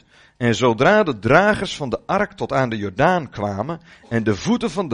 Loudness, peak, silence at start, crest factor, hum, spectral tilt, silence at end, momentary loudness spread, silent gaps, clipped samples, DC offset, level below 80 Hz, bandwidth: -19 LUFS; 0 dBFS; 0.4 s; 20 dB; none; -6 dB/octave; 0 s; 11 LU; none; under 0.1%; under 0.1%; -46 dBFS; 10.5 kHz